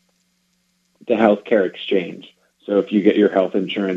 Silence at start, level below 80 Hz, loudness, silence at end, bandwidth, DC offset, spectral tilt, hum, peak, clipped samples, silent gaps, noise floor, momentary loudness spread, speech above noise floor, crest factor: 1.1 s; -68 dBFS; -18 LUFS; 0 s; 7.4 kHz; under 0.1%; -7.5 dB/octave; none; 0 dBFS; under 0.1%; none; -66 dBFS; 19 LU; 48 dB; 20 dB